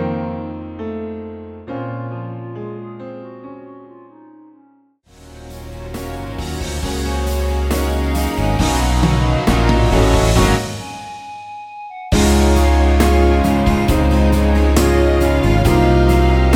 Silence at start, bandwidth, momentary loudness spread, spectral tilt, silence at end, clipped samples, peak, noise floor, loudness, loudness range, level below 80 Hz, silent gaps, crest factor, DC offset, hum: 0 s; 16.5 kHz; 19 LU; -6 dB/octave; 0 s; under 0.1%; 0 dBFS; -53 dBFS; -16 LUFS; 19 LU; -20 dBFS; none; 16 dB; under 0.1%; none